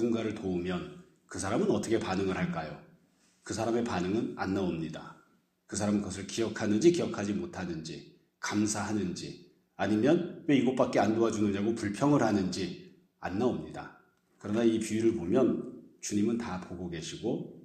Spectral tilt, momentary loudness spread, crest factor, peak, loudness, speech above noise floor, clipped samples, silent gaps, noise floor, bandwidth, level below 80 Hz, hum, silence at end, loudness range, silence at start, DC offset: -5.5 dB/octave; 17 LU; 20 dB; -12 dBFS; -31 LUFS; 37 dB; under 0.1%; none; -67 dBFS; 12.5 kHz; -64 dBFS; none; 0.05 s; 5 LU; 0 s; under 0.1%